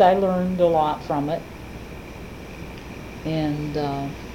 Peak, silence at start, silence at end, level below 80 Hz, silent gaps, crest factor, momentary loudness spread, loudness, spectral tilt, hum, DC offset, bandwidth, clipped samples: -4 dBFS; 0 s; 0 s; -44 dBFS; none; 20 dB; 18 LU; -23 LUFS; -7.5 dB/octave; none; under 0.1%; 17 kHz; under 0.1%